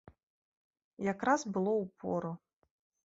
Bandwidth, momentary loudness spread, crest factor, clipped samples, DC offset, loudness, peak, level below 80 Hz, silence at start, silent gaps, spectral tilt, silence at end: 7.6 kHz; 10 LU; 22 dB; under 0.1%; under 0.1%; -34 LUFS; -16 dBFS; -72 dBFS; 1 s; none; -6 dB/octave; 0.7 s